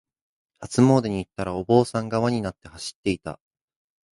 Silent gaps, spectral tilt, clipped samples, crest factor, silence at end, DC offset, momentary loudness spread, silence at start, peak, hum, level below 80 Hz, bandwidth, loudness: 2.95-3.03 s; -6.5 dB/octave; under 0.1%; 22 dB; 0.85 s; under 0.1%; 17 LU; 0.6 s; -4 dBFS; none; -52 dBFS; 11.5 kHz; -23 LUFS